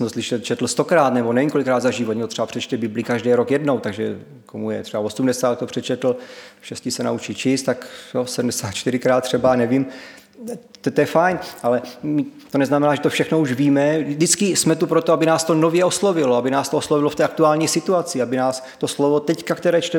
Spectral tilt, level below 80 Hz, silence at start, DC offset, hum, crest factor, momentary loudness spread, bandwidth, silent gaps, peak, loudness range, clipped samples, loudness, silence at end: -4.5 dB/octave; -62 dBFS; 0 s; under 0.1%; none; 18 dB; 10 LU; 19 kHz; none; -2 dBFS; 6 LU; under 0.1%; -19 LUFS; 0 s